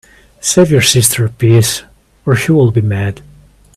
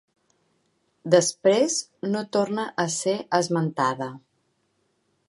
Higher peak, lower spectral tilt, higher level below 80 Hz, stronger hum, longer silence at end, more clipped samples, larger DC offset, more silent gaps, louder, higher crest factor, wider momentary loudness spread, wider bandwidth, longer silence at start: first, 0 dBFS vs -4 dBFS; about the same, -4.5 dB/octave vs -4 dB/octave; first, -42 dBFS vs -76 dBFS; neither; second, 0.6 s vs 1.1 s; neither; neither; neither; first, -11 LUFS vs -24 LUFS; second, 12 dB vs 22 dB; first, 13 LU vs 9 LU; first, 16 kHz vs 11.5 kHz; second, 0.45 s vs 1.05 s